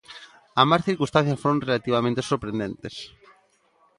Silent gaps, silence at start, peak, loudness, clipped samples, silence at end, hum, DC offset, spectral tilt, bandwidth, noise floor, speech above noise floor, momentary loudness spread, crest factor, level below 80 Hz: none; 0.1 s; -2 dBFS; -23 LUFS; under 0.1%; 0.9 s; none; under 0.1%; -6 dB/octave; 11.5 kHz; -63 dBFS; 40 dB; 19 LU; 22 dB; -56 dBFS